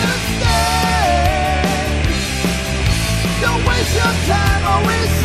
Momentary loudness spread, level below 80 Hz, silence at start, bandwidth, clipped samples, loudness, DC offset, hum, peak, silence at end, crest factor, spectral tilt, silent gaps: 3 LU; -22 dBFS; 0 s; 15 kHz; under 0.1%; -16 LUFS; 0.2%; none; -2 dBFS; 0 s; 14 dB; -4.5 dB/octave; none